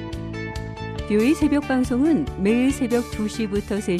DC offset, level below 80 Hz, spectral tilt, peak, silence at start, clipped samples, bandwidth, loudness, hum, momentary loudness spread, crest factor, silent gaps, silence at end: under 0.1%; -38 dBFS; -6 dB/octave; -8 dBFS; 0 s; under 0.1%; 14.5 kHz; -22 LUFS; none; 12 LU; 14 dB; none; 0 s